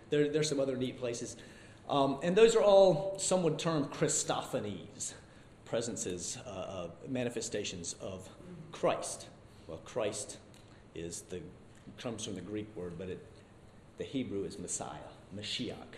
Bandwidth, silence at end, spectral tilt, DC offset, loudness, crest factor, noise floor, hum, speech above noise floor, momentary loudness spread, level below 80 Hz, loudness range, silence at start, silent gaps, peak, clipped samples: 14.5 kHz; 0 s; -4 dB/octave; under 0.1%; -34 LUFS; 22 dB; -57 dBFS; none; 23 dB; 20 LU; -64 dBFS; 14 LU; 0 s; none; -12 dBFS; under 0.1%